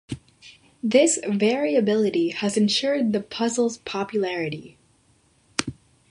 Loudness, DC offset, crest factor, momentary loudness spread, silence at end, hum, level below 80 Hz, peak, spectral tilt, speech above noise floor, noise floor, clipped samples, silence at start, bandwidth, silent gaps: -23 LUFS; under 0.1%; 22 dB; 11 LU; 0.4 s; none; -60 dBFS; -2 dBFS; -4 dB/octave; 39 dB; -61 dBFS; under 0.1%; 0.1 s; 11.5 kHz; none